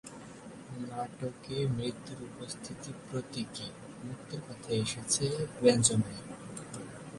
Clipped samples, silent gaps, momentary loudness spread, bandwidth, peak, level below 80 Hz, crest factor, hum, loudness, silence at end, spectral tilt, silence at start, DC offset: under 0.1%; none; 17 LU; 11.5 kHz; -10 dBFS; -62 dBFS; 26 dB; none; -34 LUFS; 0 s; -4.5 dB/octave; 0.05 s; under 0.1%